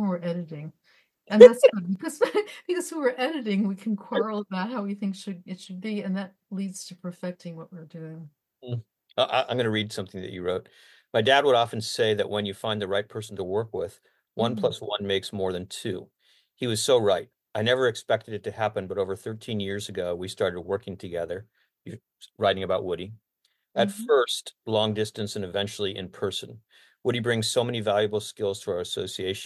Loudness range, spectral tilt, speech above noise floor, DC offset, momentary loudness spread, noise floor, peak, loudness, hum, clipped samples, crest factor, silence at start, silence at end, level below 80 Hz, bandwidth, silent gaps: 11 LU; -4.5 dB/octave; 48 dB; under 0.1%; 14 LU; -73 dBFS; 0 dBFS; -26 LUFS; none; under 0.1%; 26 dB; 0 s; 0 s; -60 dBFS; 12.5 kHz; none